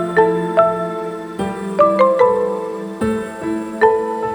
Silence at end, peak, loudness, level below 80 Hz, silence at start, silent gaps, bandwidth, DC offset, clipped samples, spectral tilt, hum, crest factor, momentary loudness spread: 0 s; 0 dBFS; -17 LUFS; -50 dBFS; 0 s; none; 19.5 kHz; under 0.1%; under 0.1%; -6.5 dB/octave; none; 16 dB; 11 LU